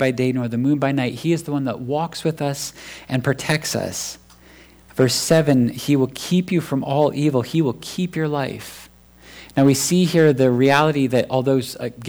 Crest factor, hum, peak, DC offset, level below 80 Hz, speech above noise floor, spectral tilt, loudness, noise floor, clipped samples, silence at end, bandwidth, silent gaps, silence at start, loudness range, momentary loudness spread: 14 dB; none; -6 dBFS; under 0.1%; -54 dBFS; 28 dB; -5.5 dB/octave; -20 LUFS; -47 dBFS; under 0.1%; 0 s; over 20 kHz; none; 0 s; 5 LU; 11 LU